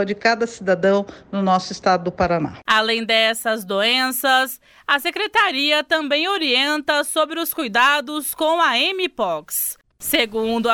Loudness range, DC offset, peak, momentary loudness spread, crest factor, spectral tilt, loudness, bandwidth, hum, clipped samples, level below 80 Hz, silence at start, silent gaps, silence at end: 1 LU; under 0.1%; -4 dBFS; 6 LU; 16 dB; -3 dB/octave; -19 LUFS; 19.5 kHz; none; under 0.1%; -54 dBFS; 0 s; none; 0 s